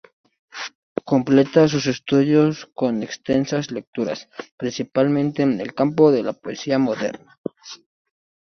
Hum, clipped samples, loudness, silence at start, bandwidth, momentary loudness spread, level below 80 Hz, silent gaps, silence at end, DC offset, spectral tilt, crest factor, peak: none; under 0.1%; -20 LUFS; 0.55 s; 6.6 kHz; 17 LU; -60 dBFS; 0.75-0.96 s, 3.87-3.93 s, 4.52-4.58 s, 7.38-7.44 s; 0.75 s; under 0.1%; -6.5 dB/octave; 20 dB; -2 dBFS